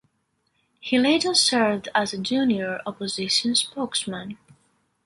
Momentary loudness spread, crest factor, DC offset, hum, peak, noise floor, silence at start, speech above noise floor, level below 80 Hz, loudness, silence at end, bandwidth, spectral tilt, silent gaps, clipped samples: 12 LU; 18 dB; under 0.1%; none; -6 dBFS; -72 dBFS; 0.85 s; 48 dB; -64 dBFS; -22 LUFS; 0.7 s; 11.5 kHz; -2.5 dB/octave; none; under 0.1%